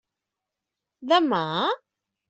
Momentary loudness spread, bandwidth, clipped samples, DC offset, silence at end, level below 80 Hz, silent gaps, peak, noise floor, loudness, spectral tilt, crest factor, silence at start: 13 LU; 8.2 kHz; under 0.1%; under 0.1%; 0.55 s; -74 dBFS; none; -8 dBFS; -86 dBFS; -23 LUFS; -5.5 dB/octave; 18 dB; 1 s